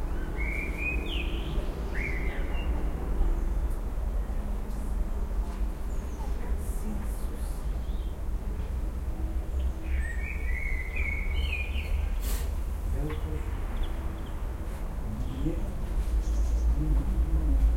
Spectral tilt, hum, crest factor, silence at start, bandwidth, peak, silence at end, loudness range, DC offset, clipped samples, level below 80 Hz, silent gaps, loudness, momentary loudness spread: -6 dB/octave; none; 14 dB; 0 s; 16 kHz; -14 dBFS; 0 s; 3 LU; under 0.1%; under 0.1%; -30 dBFS; none; -33 LUFS; 7 LU